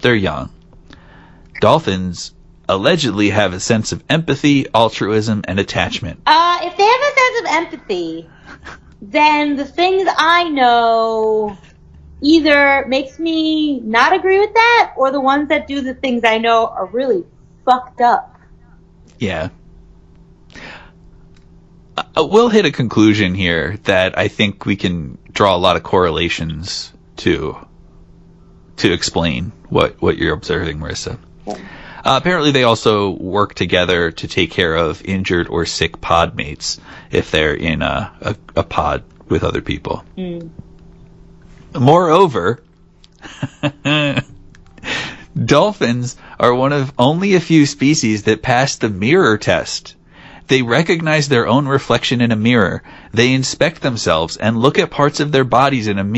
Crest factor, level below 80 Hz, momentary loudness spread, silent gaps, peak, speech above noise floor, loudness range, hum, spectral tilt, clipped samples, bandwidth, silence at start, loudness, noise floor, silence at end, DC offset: 16 dB; -40 dBFS; 13 LU; none; 0 dBFS; 32 dB; 6 LU; none; -5 dB/octave; under 0.1%; 11 kHz; 0 s; -15 LUFS; -47 dBFS; 0 s; under 0.1%